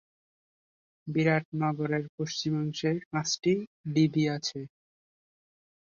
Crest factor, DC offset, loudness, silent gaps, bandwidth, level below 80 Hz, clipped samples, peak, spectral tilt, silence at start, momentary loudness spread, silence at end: 20 dB; under 0.1%; -29 LUFS; 1.45-1.52 s, 2.09-2.18 s, 3.06-3.11 s, 3.67-3.84 s; 7.4 kHz; -70 dBFS; under 0.1%; -12 dBFS; -5.5 dB/octave; 1.05 s; 8 LU; 1.25 s